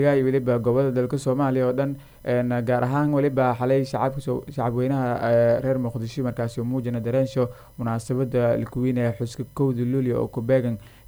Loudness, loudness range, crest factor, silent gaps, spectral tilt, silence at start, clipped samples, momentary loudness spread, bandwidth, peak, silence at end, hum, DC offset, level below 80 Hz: -24 LUFS; 3 LU; 14 dB; none; -8 dB/octave; 0 s; under 0.1%; 8 LU; over 20 kHz; -10 dBFS; 0.2 s; none; under 0.1%; -52 dBFS